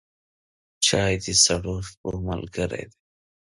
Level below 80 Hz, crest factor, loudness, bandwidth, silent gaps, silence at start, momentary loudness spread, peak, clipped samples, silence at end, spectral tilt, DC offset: -44 dBFS; 22 dB; -23 LUFS; 11.5 kHz; 1.97-2.04 s; 0.8 s; 14 LU; -4 dBFS; under 0.1%; 0.65 s; -2.5 dB/octave; under 0.1%